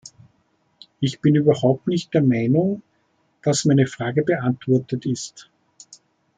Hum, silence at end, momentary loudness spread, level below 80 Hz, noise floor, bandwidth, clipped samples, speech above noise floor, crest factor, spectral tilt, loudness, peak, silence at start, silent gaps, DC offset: none; 0.95 s; 9 LU; -62 dBFS; -66 dBFS; 9.4 kHz; under 0.1%; 46 dB; 18 dB; -6.5 dB/octave; -20 LUFS; -4 dBFS; 0.05 s; none; under 0.1%